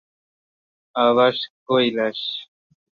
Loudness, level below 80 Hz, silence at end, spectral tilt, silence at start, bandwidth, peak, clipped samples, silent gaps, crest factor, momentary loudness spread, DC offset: -20 LUFS; -70 dBFS; 0.55 s; -6.5 dB/octave; 0.95 s; 6.6 kHz; -4 dBFS; under 0.1%; 1.50-1.66 s; 18 dB; 13 LU; under 0.1%